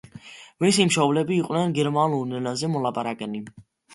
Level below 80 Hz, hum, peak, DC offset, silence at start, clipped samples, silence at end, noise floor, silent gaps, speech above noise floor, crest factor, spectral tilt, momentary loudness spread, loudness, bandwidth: -64 dBFS; none; -6 dBFS; under 0.1%; 0.15 s; under 0.1%; 0 s; -45 dBFS; none; 22 dB; 18 dB; -5 dB/octave; 20 LU; -23 LUFS; 11.5 kHz